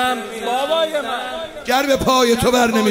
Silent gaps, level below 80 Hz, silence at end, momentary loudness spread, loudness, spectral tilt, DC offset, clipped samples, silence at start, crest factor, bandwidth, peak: none; -42 dBFS; 0 s; 10 LU; -17 LUFS; -3.5 dB/octave; under 0.1%; under 0.1%; 0 s; 16 dB; 16.5 kHz; -2 dBFS